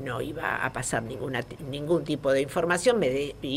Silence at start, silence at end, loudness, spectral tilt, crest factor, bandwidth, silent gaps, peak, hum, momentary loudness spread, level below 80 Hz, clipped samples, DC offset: 0 s; 0 s; -27 LUFS; -4.5 dB/octave; 18 dB; 16 kHz; none; -10 dBFS; none; 9 LU; -52 dBFS; under 0.1%; under 0.1%